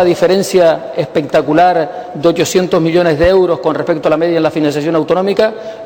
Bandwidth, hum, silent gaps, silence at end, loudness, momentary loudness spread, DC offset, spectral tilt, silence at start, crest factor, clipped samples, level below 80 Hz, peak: 19 kHz; none; none; 0 s; -12 LUFS; 6 LU; under 0.1%; -5.5 dB/octave; 0 s; 10 dB; under 0.1%; -38 dBFS; -2 dBFS